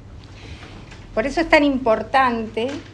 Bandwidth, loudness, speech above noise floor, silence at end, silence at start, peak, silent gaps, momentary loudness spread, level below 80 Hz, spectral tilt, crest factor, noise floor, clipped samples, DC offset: 10.5 kHz; -19 LUFS; 20 dB; 0 s; 0 s; -2 dBFS; none; 23 LU; -42 dBFS; -5 dB/octave; 20 dB; -39 dBFS; under 0.1%; under 0.1%